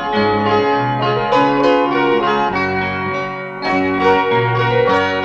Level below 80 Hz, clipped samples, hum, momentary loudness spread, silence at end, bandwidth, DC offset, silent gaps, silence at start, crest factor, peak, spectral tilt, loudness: -46 dBFS; under 0.1%; none; 6 LU; 0 s; 7.8 kHz; under 0.1%; none; 0 s; 14 dB; -2 dBFS; -7 dB/octave; -15 LUFS